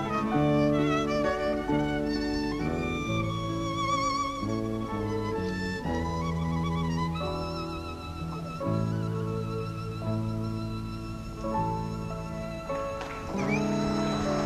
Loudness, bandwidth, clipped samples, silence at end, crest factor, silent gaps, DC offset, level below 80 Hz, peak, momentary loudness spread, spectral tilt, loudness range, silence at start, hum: -30 LUFS; 14 kHz; under 0.1%; 0 s; 16 dB; none; under 0.1%; -44 dBFS; -14 dBFS; 9 LU; -6.5 dB/octave; 5 LU; 0 s; none